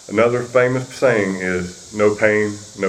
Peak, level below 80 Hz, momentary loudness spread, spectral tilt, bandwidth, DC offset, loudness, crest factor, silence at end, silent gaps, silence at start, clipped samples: 0 dBFS; -56 dBFS; 8 LU; -5.5 dB/octave; 13 kHz; under 0.1%; -18 LUFS; 18 dB; 0 s; none; 0.1 s; under 0.1%